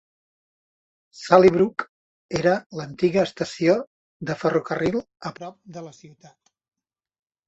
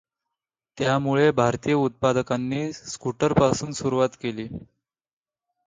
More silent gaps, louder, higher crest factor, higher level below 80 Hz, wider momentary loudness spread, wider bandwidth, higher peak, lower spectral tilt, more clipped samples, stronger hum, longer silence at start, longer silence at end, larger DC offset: first, 1.89-2.29 s, 2.66-2.70 s, 3.87-4.20 s vs none; about the same, -22 LUFS vs -23 LUFS; about the same, 22 dB vs 20 dB; second, -58 dBFS vs -52 dBFS; first, 23 LU vs 11 LU; second, 8 kHz vs 9.6 kHz; about the same, -2 dBFS vs -4 dBFS; about the same, -6.5 dB/octave vs -6 dB/octave; neither; neither; first, 1.15 s vs 0.75 s; first, 1.4 s vs 1.05 s; neither